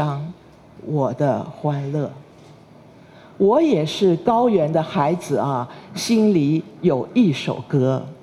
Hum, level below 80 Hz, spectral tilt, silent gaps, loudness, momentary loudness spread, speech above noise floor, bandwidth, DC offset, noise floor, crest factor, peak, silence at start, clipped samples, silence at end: none; -62 dBFS; -7 dB/octave; none; -20 LUFS; 10 LU; 27 dB; 13.5 kHz; under 0.1%; -46 dBFS; 18 dB; -2 dBFS; 0 s; under 0.1%; 0.05 s